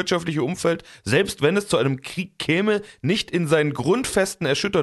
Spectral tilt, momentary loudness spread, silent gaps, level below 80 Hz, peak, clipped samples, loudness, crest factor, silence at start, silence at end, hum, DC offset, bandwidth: -5 dB/octave; 5 LU; none; -52 dBFS; -4 dBFS; under 0.1%; -22 LUFS; 18 dB; 0 s; 0 s; none; under 0.1%; 12.5 kHz